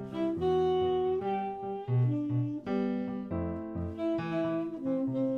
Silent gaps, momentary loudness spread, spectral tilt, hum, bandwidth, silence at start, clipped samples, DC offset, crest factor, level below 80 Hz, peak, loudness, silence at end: none; 7 LU; -9.5 dB/octave; none; 6.2 kHz; 0 s; under 0.1%; under 0.1%; 12 dB; -58 dBFS; -20 dBFS; -32 LUFS; 0 s